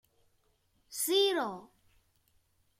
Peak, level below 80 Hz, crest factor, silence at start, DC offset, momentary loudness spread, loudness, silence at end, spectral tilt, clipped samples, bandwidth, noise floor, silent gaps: -18 dBFS; -76 dBFS; 20 dB; 0.9 s; under 0.1%; 17 LU; -30 LUFS; 1.15 s; -1.5 dB/octave; under 0.1%; 16.5 kHz; -73 dBFS; none